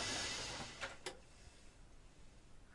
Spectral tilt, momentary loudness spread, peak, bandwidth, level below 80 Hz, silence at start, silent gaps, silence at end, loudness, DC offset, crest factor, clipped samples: -1.5 dB/octave; 24 LU; -30 dBFS; 11.5 kHz; -62 dBFS; 0 s; none; 0 s; -45 LUFS; under 0.1%; 18 dB; under 0.1%